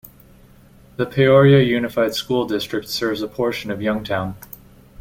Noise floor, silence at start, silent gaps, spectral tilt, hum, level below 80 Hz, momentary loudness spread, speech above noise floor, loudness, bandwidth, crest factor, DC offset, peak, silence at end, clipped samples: -48 dBFS; 1 s; none; -6.5 dB/octave; none; -48 dBFS; 15 LU; 30 dB; -19 LUFS; 17 kHz; 18 dB; under 0.1%; -2 dBFS; 0.65 s; under 0.1%